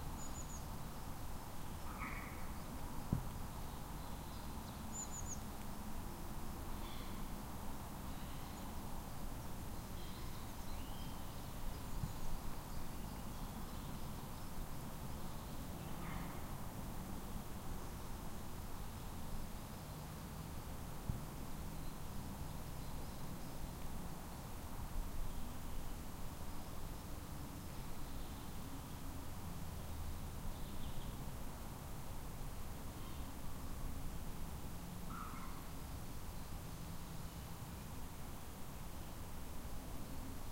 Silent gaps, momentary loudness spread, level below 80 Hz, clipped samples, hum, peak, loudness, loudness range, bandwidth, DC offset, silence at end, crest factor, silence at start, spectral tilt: none; 3 LU; -48 dBFS; under 0.1%; none; -22 dBFS; -49 LUFS; 2 LU; 16 kHz; under 0.1%; 0 s; 24 dB; 0 s; -5 dB/octave